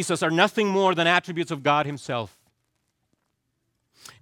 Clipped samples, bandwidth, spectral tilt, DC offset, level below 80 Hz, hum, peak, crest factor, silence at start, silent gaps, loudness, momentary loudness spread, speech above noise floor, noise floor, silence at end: under 0.1%; 17 kHz; -4.5 dB/octave; under 0.1%; -72 dBFS; none; -4 dBFS; 22 dB; 0 s; none; -23 LUFS; 10 LU; 53 dB; -76 dBFS; 1.95 s